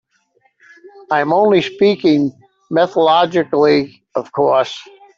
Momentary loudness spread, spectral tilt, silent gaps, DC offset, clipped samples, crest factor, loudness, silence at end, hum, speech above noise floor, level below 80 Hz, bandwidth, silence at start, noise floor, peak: 10 LU; -6.5 dB/octave; none; under 0.1%; under 0.1%; 14 dB; -15 LUFS; 0.35 s; none; 46 dB; -60 dBFS; 7.4 kHz; 1.1 s; -60 dBFS; -2 dBFS